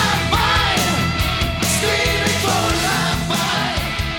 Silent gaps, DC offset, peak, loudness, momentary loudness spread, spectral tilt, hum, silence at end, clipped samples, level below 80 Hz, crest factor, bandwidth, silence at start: none; under 0.1%; -4 dBFS; -17 LUFS; 4 LU; -3.5 dB/octave; none; 0 s; under 0.1%; -30 dBFS; 14 dB; 17.5 kHz; 0 s